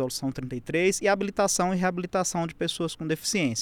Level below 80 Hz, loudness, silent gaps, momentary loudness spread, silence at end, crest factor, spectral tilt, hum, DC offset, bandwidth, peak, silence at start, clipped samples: -56 dBFS; -27 LUFS; none; 7 LU; 0 s; 16 dB; -4 dB/octave; none; under 0.1%; 18 kHz; -12 dBFS; 0 s; under 0.1%